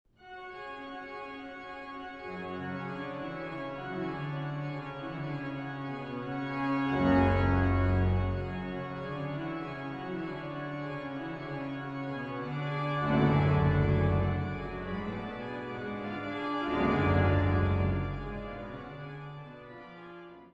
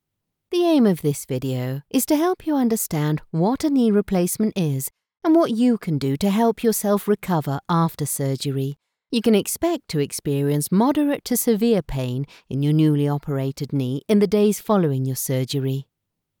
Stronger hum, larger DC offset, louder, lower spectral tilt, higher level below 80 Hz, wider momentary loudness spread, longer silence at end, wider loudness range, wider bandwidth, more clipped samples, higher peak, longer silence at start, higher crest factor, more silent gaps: neither; neither; second, -32 LUFS vs -21 LUFS; first, -9 dB/octave vs -6 dB/octave; first, -46 dBFS vs -52 dBFS; first, 16 LU vs 8 LU; second, 0.05 s vs 0.6 s; first, 8 LU vs 2 LU; second, 5.8 kHz vs 20 kHz; neither; second, -14 dBFS vs -6 dBFS; second, 0.2 s vs 0.5 s; about the same, 18 dB vs 16 dB; neither